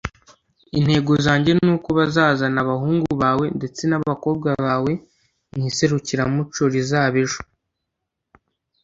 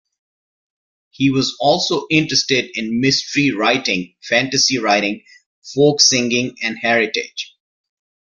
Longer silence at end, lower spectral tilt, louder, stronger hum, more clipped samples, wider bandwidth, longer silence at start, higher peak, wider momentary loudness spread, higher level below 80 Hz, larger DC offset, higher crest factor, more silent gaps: first, 1.4 s vs 0.9 s; first, -6 dB/octave vs -3 dB/octave; second, -20 LUFS vs -16 LUFS; neither; neither; second, 8 kHz vs 11 kHz; second, 0.05 s vs 1.2 s; about the same, -2 dBFS vs 0 dBFS; about the same, 8 LU vs 10 LU; first, -48 dBFS vs -58 dBFS; neither; about the same, 18 dB vs 18 dB; second, none vs 5.46-5.62 s